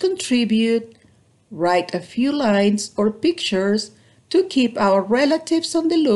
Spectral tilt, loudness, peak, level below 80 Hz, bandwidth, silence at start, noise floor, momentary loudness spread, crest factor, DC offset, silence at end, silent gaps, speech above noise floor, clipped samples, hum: -4.5 dB/octave; -19 LUFS; -6 dBFS; -62 dBFS; 12 kHz; 0 s; -55 dBFS; 6 LU; 14 dB; under 0.1%; 0 s; none; 37 dB; under 0.1%; none